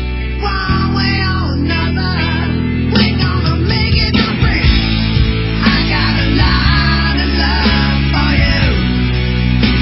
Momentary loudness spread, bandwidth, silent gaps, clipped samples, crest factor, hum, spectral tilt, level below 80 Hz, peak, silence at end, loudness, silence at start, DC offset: 4 LU; 5.8 kHz; none; under 0.1%; 12 dB; none; -9.5 dB/octave; -18 dBFS; 0 dBFS; 0 s; -13 LUFS; 0 s; under 0.1%